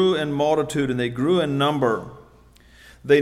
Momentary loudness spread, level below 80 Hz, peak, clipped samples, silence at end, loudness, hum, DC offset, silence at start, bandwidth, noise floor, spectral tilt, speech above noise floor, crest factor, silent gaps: 8 LU; -54 dBFS; -6 dBFS; under 0.1%; 0 s; -22 LUFS; none; under 0.1%; 0 s; 14.5 kHz; -51 dBFS; -6 dB/octave; 30 dB; 16 dB; none